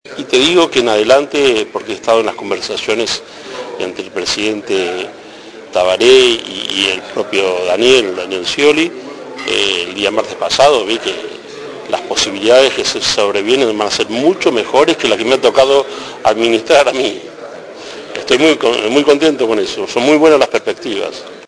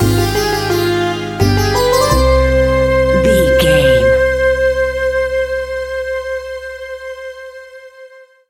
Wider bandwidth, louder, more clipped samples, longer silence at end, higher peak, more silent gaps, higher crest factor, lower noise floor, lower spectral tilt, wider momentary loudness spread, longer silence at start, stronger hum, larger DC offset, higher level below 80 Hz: second, 11 kHz vs 17 kHz; about the same, -12 LUFS vs -13 LUFS; first, 0.1% vs under 0.1%; second, 0 s vs 0.3 s; about the same, 0 dBFS vs 0 dBFS; neither; about the same, 14 dB vs 14 dB; second, -33 dBFS vs -39 dBFS; second, -2.5 dB/octave vs -5 dB/octave; about the same, 15 LU vs 16 LU; about the same, 0.05 s vs 0 s; neither; neither; second, -50 dBFS vs -24 dBFS